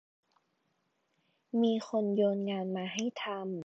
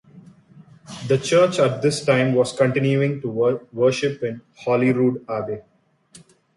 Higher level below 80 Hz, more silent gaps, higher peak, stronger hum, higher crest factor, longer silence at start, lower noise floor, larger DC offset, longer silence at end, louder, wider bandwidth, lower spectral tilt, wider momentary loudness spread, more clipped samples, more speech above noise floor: second, -86 dBFS vs -62 dBFS; neither; second, -18 dBFS vs -4 dBFS; neither; about the same, 16 dB vs 18 dB; first, 1.55 s vs 0.15 s; first, -78 dBFS vs -51 dBFS; neither; second, 0.05 s vs 0.4 s; second, -33 LUFS vs -20 LUFS; second, 7.8 kHz vs 11.5 kHz; about the same, -5.5 dB/octave vs -6 dB/octave; second, 7 LU vs 12 LU; neither; first, 46 dB vs 32 dB